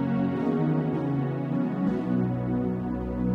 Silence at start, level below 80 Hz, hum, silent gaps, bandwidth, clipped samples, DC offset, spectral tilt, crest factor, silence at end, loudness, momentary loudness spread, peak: 0 s; -46 dBFS; none; none; 5.6 kHz; under 0.1%; under 0.1%; -10.5 dB/octave; 12 dB; 0 s; -27 LUFS; 3 LU; -14 dBFS